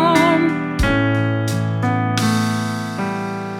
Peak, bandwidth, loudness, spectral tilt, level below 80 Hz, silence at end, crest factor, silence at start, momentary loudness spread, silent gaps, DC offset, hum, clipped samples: -2 dBFS; 16 kHz; -18 LUFS; -6 dB/octave; -34 dBFS; 0 s; 16 dB; 0 s; 8 LU; none; under 0.1%; none; under 0.1%